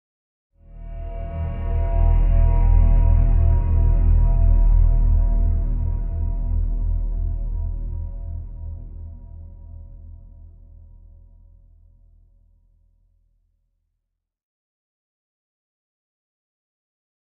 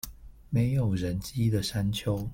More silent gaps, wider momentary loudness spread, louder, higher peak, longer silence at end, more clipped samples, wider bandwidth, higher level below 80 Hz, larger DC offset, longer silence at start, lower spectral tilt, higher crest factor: neither; first, 22 LU vs 5 LU; first, -22 LUFS vs -29 LUFS; first, -6 dBFS vs -14 dBFS; first, 6.75 s vs 0 s; neither; second, 2.7 kHz vs 17 kHz; first, -22 dBFS vs -46 dBFS; neither; first, 0.75 s vs 0.05 s; first, -13 dB/octave vs -6.5 dB/octave; about the same, 16 dB vs 14 dB